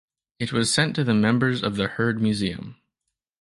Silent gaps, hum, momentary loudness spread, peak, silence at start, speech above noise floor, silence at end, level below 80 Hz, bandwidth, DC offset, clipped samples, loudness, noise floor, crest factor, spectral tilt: none; none; 10 LU; -6 dBFS; 0.4 s; 60 dB; 0.7 s; -54 dBFS; 11.5 kHz; under 0.1%; under 0.1%; -23 LUFS; -82 dBFS; 18 dB; -5 dB/octave